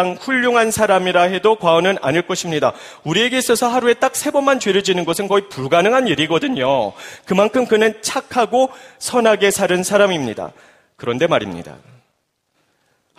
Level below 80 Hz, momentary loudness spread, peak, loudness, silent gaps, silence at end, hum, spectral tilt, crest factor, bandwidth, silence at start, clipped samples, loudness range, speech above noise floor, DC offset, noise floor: -56 dBFS; 8 LU; 0 dBFS; -16 LUFS; none; 1.45 s; none; -3.5 dB/octave; 16 dB; 15.5 kHz; 0 s; under 0.1%; 2 LU; 52 dB; under 0.1%; -68 dBFS